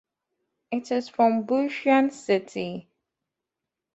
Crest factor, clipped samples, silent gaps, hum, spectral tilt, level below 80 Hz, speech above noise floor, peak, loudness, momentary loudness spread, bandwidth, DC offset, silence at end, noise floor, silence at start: 20 dB; under 0.1%; none; none; -5.5 dB/octave; -72 dBFS; 63 dB; -8 dBFS; -25 LUFS; 11 LU; 8.2 kHz; under 0.1%; 1.15 s; -86 dBFS; 0.7 s